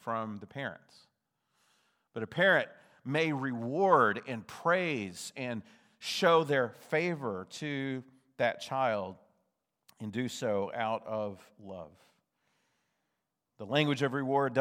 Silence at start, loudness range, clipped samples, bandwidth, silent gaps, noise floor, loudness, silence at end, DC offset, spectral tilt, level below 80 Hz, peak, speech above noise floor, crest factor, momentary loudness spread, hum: 0.05 s; 8 LU; under 0.1%; 16 kHz; none; -84 dBFS; -32 LUFS; 0 s; under 0.1%; -5 dB/octave; -84 dBFS; -10 dBFS; 53 dB; 24 dB; 17 LU; none